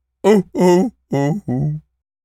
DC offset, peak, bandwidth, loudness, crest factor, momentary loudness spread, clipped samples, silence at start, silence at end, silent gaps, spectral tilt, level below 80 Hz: under 0.1%; 0 dBFS; 15 kHz; -17 LUFS; 16 dB; 8 LU; under 0.1%; 0.25 s; 0.45 s; none; -7.5 dB/octave; -52 dBFS